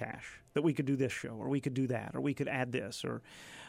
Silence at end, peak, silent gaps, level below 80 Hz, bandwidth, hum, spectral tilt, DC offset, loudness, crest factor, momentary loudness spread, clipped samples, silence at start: 0 s; -18 dBFS; none; -70 dBFS; 15 kHz; none; -6.5 dB/octave; under 0.1%; -36 LUFS; 18 dB; 10 LU; under 0.1%; 0 s